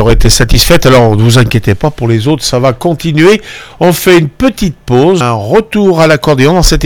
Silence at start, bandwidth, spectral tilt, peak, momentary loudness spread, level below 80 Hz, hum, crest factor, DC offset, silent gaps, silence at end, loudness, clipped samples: 0 s; over 20 kHz; -5 dB/octave; 0 dBFS; 6 LU; -18 dBFS; none; 6 dB; under 0.1%; none; 0 s; -8 LUFS; 5%